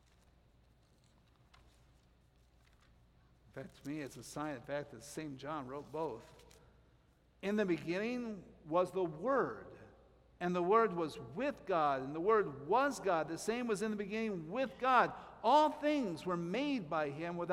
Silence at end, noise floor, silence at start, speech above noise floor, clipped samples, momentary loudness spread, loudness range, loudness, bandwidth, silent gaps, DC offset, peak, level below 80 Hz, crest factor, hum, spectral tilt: 0 s; -69 dBFS; 3.55 s; 33 dB; under 0.1%; 15 LU; 13 LU; -36 LUFS; 15.5 kHz; none; under 0.1%; -16 dBFS; -70 dBFS; 22 dB; none; -5.5 dB/octave